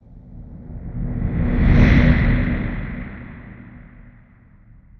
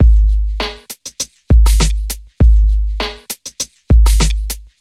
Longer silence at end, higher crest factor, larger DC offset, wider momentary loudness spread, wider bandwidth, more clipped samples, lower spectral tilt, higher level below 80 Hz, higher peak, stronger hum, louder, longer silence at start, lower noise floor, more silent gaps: first, 1.15 s vs 0.2 s; first, 18 dB vs 12 dB; neither; first, 26 LU vs 14 LU; second, 6.4 kHz vs 14 kHz; neither; first, -9 dB/octave vs -4.5 dB/octave; second, -24 dBFS vs -12 dBFS; about the same, -2 dBFS vs 0 dBFS; neither; second, -19 LUFS vs -16 LUFS; first, 0.15 s vs 0 s; first, -49 dBFS vs -32 dBFS; neither